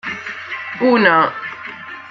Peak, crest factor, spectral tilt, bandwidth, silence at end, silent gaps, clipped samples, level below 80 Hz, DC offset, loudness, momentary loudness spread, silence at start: -2 dBFS; 16 dB; -6 dB/octave; 7.2 kHz; 0 s; none; under 0.1%; -62 dBFS; under 0.1%; -16 LUFS; 18 LU; 0.05 s